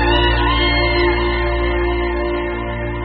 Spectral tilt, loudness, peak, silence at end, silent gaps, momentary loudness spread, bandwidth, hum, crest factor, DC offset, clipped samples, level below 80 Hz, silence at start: -3.5 dB/octave; -17 LUFS; -4 dBFS; 0 s; none; 7 LU; 5.2 kHz; none; 14 dB; under 0.1%; under 0.1%; -22 dBFS; 0 s